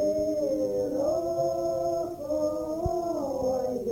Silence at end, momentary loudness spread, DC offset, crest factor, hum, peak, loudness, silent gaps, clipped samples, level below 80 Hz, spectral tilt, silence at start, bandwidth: 0 s; 3 LU; under 0.1%; 12 dB; none; -16 dBFS; -29 LUFS; none; under 0.1%; -50 dBFS; -7 dB/octave; 0 s; 17 kHz